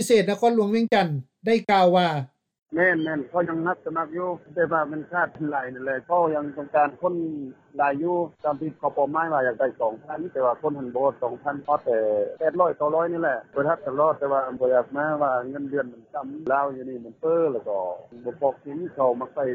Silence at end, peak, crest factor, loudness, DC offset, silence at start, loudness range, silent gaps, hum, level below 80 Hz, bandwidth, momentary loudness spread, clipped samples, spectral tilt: 0 s; -6 dBFS; 18 dB; -24 LUFS; under 0.1%; 0 s; 4 LU; 2.58-2.66 s; none; -70 dBFS; 15.5 kHz; 9 LU; under 0.1%; -6 dB/octave